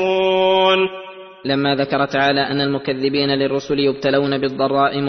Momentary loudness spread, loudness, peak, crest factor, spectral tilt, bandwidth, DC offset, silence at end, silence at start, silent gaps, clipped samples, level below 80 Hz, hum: 7 LU; -17 LUFS; -2 dBFS; 16 dB; -6 dB/octave; 6.4 kHz; under 0.1%; 0 s; 0 s; none; under 0.1%; -56 dBFS; none